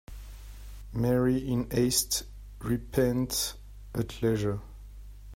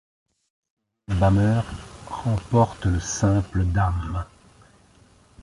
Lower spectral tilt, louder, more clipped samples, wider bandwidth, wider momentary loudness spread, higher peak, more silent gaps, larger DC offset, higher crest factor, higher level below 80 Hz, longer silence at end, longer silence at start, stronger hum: second, -5 dB/octave vs -6.5 dB/octave; second, -29 LUFS vs -23 LUFS; neither; first, 16 kHz vs 11.5 kHz; first, 22 LU vs 13 LU; second, -10 dBFS vs -6 dBFS; neither; neither; about the same, 20 dB vs 18 dB; second, -44 dBFS vs -34 dBFS; second, 0 s vs 1.2 s; second, 0.1 s vs 1.1 s; neither